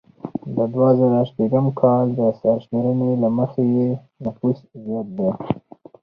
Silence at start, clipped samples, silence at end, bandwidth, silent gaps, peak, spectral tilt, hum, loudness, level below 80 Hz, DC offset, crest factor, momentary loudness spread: 0.25 s; under 0.1%; 0.45 s; 4.8 kHz; none; -2 dBFS; -12 dB/octave; none; -20 LUFS; -58 dBFS; under 0.1%; 18 dB; 12 LU